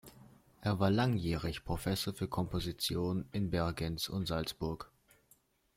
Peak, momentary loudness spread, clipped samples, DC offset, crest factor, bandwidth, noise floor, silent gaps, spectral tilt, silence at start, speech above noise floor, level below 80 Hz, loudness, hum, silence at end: -18 dBFS; 8 LU; under 0.1%; under 0.1%; 18 dB; 16.5 kHz; -70 dBFS; none; -5.5 dB/octave; 0.05 s; 35 dB; -52 dBFS; -36 LUFS; none; 0.9 s